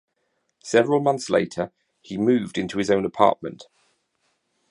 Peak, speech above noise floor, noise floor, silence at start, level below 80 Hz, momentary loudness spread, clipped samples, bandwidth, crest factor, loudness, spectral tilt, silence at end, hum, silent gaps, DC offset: -2 dBFS; 51 dB; -73 dBFS; 0.65 s; -60 dBFS; 14 LU; under 0.1%; 11 kHz; 22 dB; -22 LUFS; -5.5 dB/octave; 1.1 s; none; none; under 0.1%